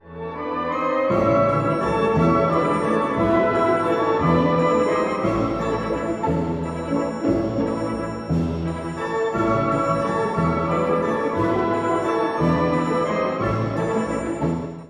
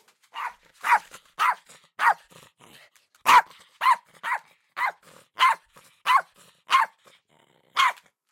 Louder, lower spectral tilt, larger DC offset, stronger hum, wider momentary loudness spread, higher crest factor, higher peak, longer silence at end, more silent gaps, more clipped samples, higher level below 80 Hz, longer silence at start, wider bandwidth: first, -21 LUFS vs -24 LUFS; first, -7.5 dB/octave vs 1 dB/octave; neither; neither; second, 7 LU vs 17 LU; about the same, 16 dB vs 20 dB; about the same, -6 dBFS vs -6 dBFS; second, 0 s vs 0.4 s; neither; neither; first, -42 dBFS vs -74 dBFS; second, 0.05 s vs 0.35 s; second, 11.5 kHz vs 16.5 kHz